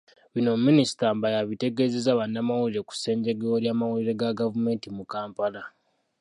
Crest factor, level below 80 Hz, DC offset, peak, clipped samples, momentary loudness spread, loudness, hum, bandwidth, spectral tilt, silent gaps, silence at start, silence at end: 18 dB; -70 dBFS; under 0.1%; -8 dBFS; under 0.1%; 12 LU; -26 LUFS; none; 11.5 kHz; -6 dB/octave; none; 0.35 s; 0.5 s